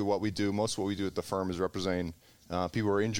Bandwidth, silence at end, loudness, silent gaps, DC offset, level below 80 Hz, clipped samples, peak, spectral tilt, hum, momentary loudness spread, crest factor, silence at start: 17 kHz; 0 s; -33 LUFS; none; 0.1%; -58 dBFS; under 0.1%; -16 dBFS; -5.5 dB/octave; none; 5 LU; 16 dB; 0 s